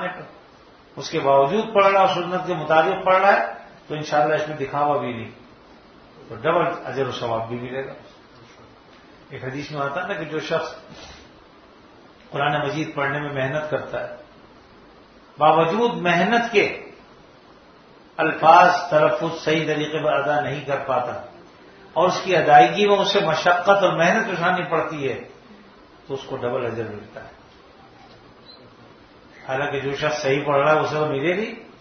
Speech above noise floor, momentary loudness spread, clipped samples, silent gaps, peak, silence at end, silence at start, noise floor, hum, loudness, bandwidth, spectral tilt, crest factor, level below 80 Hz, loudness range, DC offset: 29 dB; 18 LU; under 0.1%; none; 0 dBFS; 0.15 s; 0 s; -49 dBFS; none; -20 LUFS; 6.6 kHz; -5 dB/octave; 22 dB; -60 dBFS; 12 LU; under 0.1%